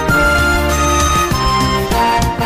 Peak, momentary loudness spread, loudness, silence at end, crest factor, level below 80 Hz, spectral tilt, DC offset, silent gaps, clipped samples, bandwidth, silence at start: -2 dBFS; 2 LU; -13 LUFS; 0 s; 10 dB; -20 dBFS; -4 dB/octave; under 0.1%; none; under 0.1%; 16 kHz; 0 s